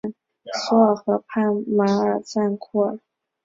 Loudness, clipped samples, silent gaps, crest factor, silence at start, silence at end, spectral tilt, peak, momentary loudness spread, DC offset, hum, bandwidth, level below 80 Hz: -21 LUFS; under 0.1%; none; 18 dB; 0.05 s; 0.45 s; -6.5 dB/octave; -4 dBFS; 12 LU; under 0.1%; none; 7.6 kHz; -66 dBFS